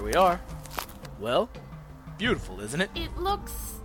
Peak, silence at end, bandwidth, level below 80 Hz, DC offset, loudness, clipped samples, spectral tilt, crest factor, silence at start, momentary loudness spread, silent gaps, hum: -8 dBFS; 0 s; 19 kHz; -42 dBFS; under 0.1%; -29 LUFS; under 0.1%; -4.5 dB/octave; 20 dB; 0 s; 18 LU; none; none